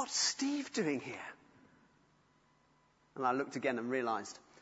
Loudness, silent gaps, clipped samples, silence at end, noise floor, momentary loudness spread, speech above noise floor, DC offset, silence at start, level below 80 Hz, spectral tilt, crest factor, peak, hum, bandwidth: -36 LUFS; none; under 0.1%; 0.2 s; -71 dBFS; 15 LU; 34 dB; under 0.1%; 0 s; -82 dBFS; -2.5 dB/octave; 20 dB; -20 dBFS; none; 8 kHz